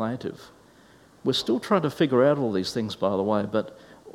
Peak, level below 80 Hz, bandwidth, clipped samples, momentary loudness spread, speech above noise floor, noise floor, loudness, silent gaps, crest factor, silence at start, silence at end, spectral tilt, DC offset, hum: -6 dBFS; -64 dBFS; 16 kHz; under 0.1%; 10 LU; 30 dB; -54 dBFS; -25 LUFS; none; 20 dB; 0 s; 0 s; -6 dB/octave; under 0.1%; none